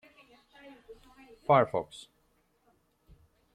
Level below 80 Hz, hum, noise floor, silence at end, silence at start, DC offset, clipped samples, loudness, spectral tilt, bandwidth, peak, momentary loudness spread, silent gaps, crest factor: -68 dBFS; none; -71 dBFS; 1.6 s; 0.9 s; under 0.1%; under 0.1%; -28 LUFS; -6.5 dB/octave; 11.5 kHz; -12 dBFS; 25 LU; none; 24 dB